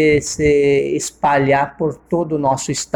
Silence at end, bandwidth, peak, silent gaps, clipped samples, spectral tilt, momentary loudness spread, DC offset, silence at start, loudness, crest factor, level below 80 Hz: 0.1 s; 13.5 kHz; -2 dBFS; none; under 0.1%; -5 dB/octave; 7 LU; under 0.1%; 0 s; -17 LUFS; 14 dB; -40 dBFS